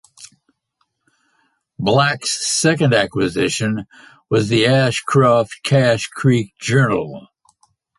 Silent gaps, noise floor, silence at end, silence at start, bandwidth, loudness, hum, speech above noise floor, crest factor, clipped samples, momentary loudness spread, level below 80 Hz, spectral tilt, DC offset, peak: none; -69 dBFS; 0.8 s; 0.2 s; 11.5 kHz; -17 LUFS; none; 53 dB; 16 dB; under 0.1%; 8 LU; -52 dBFS; -5 dB/octave; under 0.1%; -2 dBFS